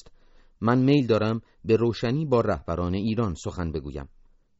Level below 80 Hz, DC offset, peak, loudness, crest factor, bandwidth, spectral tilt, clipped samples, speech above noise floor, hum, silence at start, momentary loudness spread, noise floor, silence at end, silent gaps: -46 dBFS; under 0.1%; -8 dBFS; -25 LUFS; 18 dB; 8 kHz; -7 dB/octave; under 0.1%; 30 dB; none; 0.05 s; 11 LU; -54 dBFS; 0.55 s; none